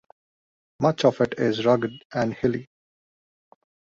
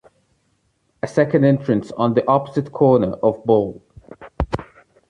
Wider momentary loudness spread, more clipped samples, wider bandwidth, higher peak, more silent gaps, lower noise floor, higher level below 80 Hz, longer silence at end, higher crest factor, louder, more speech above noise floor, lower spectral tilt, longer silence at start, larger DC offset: second, 7 LU vs 12 LU; neither; second, 7.8 kHz vs 10 kHz; about the same, -4 dBFS vs -2 dBFS; first, 2.05-2.10 s vs none; first, under -90 dBFS vs -65 dBFS; second, -60 dBFS vs -40 dBFS; first, 1.35 s vs 0.45 s; about the same, 20 dB vs 18 dB; second, -24 LUFS vs -19 LUFS; first, over 67 dB vs 48 dB; second, -6.5 dB/octave vs -8.5 dB/octave; second, 0.8 s vs 1.05 s; neither